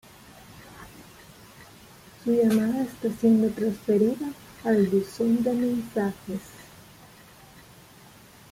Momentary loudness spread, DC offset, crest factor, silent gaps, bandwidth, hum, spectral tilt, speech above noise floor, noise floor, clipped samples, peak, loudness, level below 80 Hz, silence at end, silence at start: 24 LU; under 0.1%; 16 dB; none; 16 kHz; none; -7 dB/octave; 27 dB; -51 dBFS; under 0.1%; -10 dBFS; -25 LUFS; -60 dBFS; 1.9 s; 0.55 s